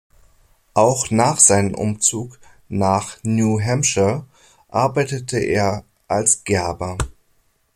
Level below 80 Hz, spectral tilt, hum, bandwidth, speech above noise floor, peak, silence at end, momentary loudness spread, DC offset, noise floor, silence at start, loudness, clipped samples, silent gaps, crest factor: -44 dBFS; -4 dB/octave; none; 16.5 kHz; 43 dB; 0 dBFS; 0.65 s; 15 LU; under 0.1%; -61 dBFS; 0.75 s; -18 LUFS; under 0.1%; none; 20 dB